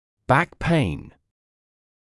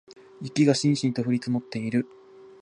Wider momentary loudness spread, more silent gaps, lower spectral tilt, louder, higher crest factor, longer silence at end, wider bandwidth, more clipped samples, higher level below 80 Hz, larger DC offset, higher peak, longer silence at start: second, 8 LU vs 11 LU; neither; about the same, -7 dB/octave vs -6 dB/octave; first, -22 LUFS vs -25 LUFS; about the same, 20 dB vs 18 dB; first, 1.1 s vs 0.15 s; about the same, 12 kHz vs 11 kHz; neither; first, -44 dBFS vs -70 dBFS; neither; about the same, -6 dBFS vs -8 dBFS; first, 0.3 s vs 0.1 s